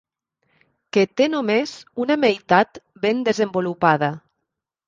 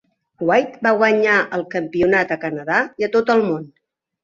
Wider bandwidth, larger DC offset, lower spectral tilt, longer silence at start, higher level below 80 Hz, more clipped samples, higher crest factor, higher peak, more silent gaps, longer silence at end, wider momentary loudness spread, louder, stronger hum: about the same, 7.6 kHz vs 7.4 kHz; neither; about the same, -5.5 dB/octave vs -6 dB/octave; first, 0.95 s vs 0.4 s; second, -64 dBFS vs -58 dBFS; neither; about the same, 20 dB vs 18 dB; about the same, -2 dBFS vs -2 dBFS; neither; first, 0.7 s vs 0.55 s; about the same, 8 LU vs 9 LU; about the same, -20 LUFS vs -18 LUFS; neither